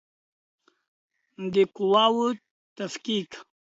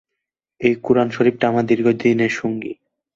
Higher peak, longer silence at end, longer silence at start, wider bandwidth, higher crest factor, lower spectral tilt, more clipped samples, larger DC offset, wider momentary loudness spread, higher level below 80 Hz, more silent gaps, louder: second, -8 dBFS vs -2 dBFS; about the same, 0.35 s vs 0.45 s; first, 1.4 s vs 0.6 s; about the same, 8 kHz vs 7.6 kHz; about the same, 20 dB vs 16 dB; second, -5 dB/octave vs -7 dB/octave; neither; neither; first, 17 LU vs 11 LU; second, -74 dBFS vs -58 dBFS; first, 2.51-2.76 s vs none; second, -25 LUFS vs -18 LUFS